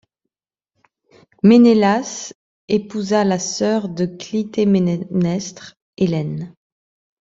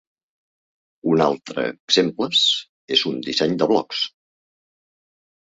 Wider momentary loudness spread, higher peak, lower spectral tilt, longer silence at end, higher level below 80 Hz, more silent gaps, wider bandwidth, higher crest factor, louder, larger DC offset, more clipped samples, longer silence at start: first, 16 LU vs 9 LU; about the same, -2 dBFS vs -2 dBFS; first, -6 dB/octave vs -4 dB/octave; second, 0.7 s vs 1.5 s; first, -58 dBFS vs -64 dBFS; first, 2.35-2.68 s, 5.82-5.93 s vs 1.80-1.88 s, 2.69-2.88 s; about the same, 7.8 kHz vs 8 kHz; about the same, 16 dB vs 20 dB; about the same, -18 LUFS vs -20 LUFS; neither; neither; first, 1.45 s vs 1.05 s